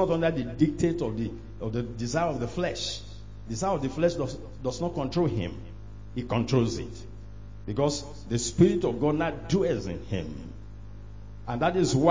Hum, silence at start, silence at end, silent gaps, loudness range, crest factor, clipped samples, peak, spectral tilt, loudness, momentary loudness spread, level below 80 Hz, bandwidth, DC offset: none; 0 s; 0 s; none; 3 LU; 20 dB; under 0.1%; -8 dBFS; -6 dB/octave; -28 LUFS; 20 LU; -44 dBFS; 7.6 kHz; 0.5%